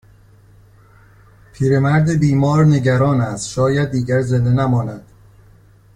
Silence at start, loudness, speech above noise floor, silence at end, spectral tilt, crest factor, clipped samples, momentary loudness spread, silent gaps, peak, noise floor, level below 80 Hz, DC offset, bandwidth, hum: 1.6 s; -16 LUFS; 32 dB; 0.95 s; -7.5 dB/octave; 14 dB; under 0.1%; 8 LU; none; -4 dBFS; -47 dBFS; -44 dBFS; under 0.1%; 11 kHz; none